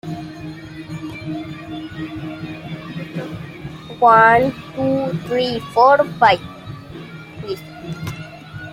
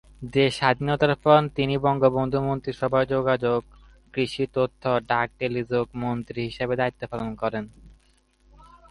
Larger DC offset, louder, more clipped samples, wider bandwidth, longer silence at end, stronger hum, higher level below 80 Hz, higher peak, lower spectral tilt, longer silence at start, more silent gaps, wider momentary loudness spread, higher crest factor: neither; first, -17 LUFS vs -24 LUFS; neither; first, 16 kHz vs 11.5 kHz; second, 0 s vs 1.05 s; neither; about the same, -50 dBFS vs -50 dBFS; about the same, -2 dBFS vs -4 dBFS; about the same, -6.5 dB/octave vs -7 dB/octave; second, 0.05 s vs 0.2 s; neither; first, 21 LU vs 9 LU; about the same, 18 dB vs 20 dB